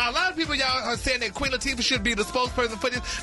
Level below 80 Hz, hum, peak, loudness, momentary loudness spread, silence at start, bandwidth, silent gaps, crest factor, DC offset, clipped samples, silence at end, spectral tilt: -40 dBFS; none; -12 dBFS; -24 LUFS; 3 LU; 0 s; 11.5 kHz; none; 14 dB; under 0.1%; under 0.1%; 0 s; -2.5 dB/octave